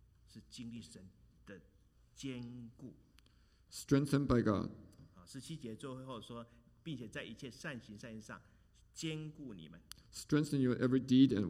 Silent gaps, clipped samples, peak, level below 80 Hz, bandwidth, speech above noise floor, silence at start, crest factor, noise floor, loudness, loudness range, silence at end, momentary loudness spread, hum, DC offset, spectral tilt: none; under 0.1%; -16 dBFS; -62 dBFS; 14.5 kHz; 30 dB; 0.35 s; 22 dB; -68 dBFS; -38 LUFS; 13 LU; 0 s; 23 LU; none; under 0.1%; -6.5 dB/octave